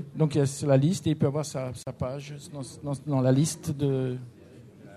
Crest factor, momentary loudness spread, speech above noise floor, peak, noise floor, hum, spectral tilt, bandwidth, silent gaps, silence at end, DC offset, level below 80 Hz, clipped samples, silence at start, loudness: 18 dB; 16 LU; 23 dB; -10 dBFS; -49 dBFS; none; -6.5 dB/octave; 13.5 kHz; none; 0 s; under 0.1%; -58 dBFS; under 0.1%; 0 s; -27 LUFS